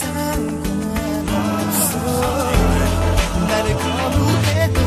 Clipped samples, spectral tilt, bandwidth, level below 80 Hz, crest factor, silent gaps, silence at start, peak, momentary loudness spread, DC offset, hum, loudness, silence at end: under 0.1%; -5 dB/octave; 15 kHz; -26 dBFS; 14 dB; none; 0 s; -2 dBFS; 5 LU; under 0.1%; none; -19 LUFS; 0 s